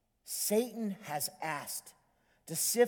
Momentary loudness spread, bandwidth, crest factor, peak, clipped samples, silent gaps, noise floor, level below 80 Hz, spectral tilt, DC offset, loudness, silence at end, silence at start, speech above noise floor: 9 LU; 19.5 kHz; 20 dB; -16 dBFS; under 0.1%; none; -62 dBFS; -80 dBFS; -3 dB/octave; under 0.1%; -35 LUFS; 0 s; 0.25 s; 28 dB